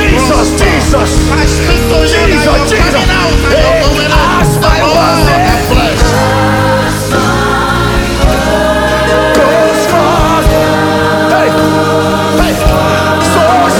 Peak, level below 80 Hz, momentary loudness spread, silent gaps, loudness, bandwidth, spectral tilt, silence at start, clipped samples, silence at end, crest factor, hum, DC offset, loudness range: 0 dBFS; -16 dBFS; 2 LU; none; -8 LUFS; 19 kHz; -5 dB/octave; 0 s; under 0.1%; 0 s; 8 dB; none; under 0.1%; 1 LU